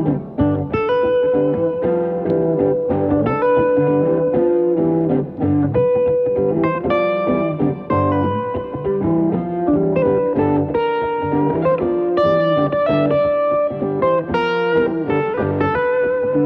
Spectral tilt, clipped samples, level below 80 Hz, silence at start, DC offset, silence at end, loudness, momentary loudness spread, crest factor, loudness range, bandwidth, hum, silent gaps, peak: -10 dB/octave; under 0.1%; -46 dBFS; 0 s; under 0.1%; 0 s; -17 LUFS; 4 LU; 12 dB; 2 LU; 5.6 kHz; none; none; -4 dBFS